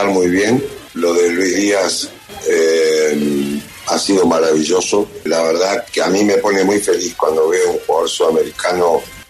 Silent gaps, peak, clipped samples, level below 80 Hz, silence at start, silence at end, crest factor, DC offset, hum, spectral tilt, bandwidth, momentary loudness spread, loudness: none; -2 dBFS; under 0.1%; -52 dBFS; 0 s; 0.05 s; 12 dB; under 0.1%; none; -3.5 dB/octave; 14 kHz; 6 LU; -15 LUFS